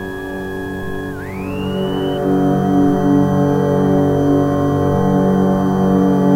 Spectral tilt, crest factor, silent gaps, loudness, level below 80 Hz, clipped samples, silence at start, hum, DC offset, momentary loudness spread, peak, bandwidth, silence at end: -8.5 dB/octave; 12 dB; none; -16 LUFS; -38 dBFS; under 0.1%; 0 s; none; under 0.1%; 11 LU; -2 dBFS; 16 kHz; 0 s